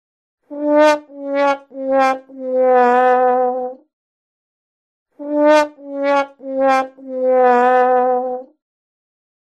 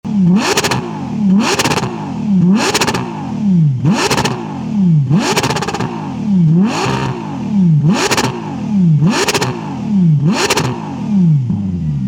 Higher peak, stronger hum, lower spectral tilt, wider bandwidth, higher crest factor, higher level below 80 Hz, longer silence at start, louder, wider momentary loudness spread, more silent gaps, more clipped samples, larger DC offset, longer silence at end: about the same, 0 dBFS vs -2 dBFS; neither; second, -3.5 dB/octave vs -5.5 dB/octave; second, 10 kHz vs 18.5 kHz; first, 16 dB vs 10 dB; second, -70 dBFS vs -44 dBFS; first, 0.5 s vs 0.05 s; about the same, -16 LUFS vs -14 LUFS; first, 12 LU vs 9 LU; first, 3.93-5.06 s vs none; neither; neither; first, 1.05 s vs 0 s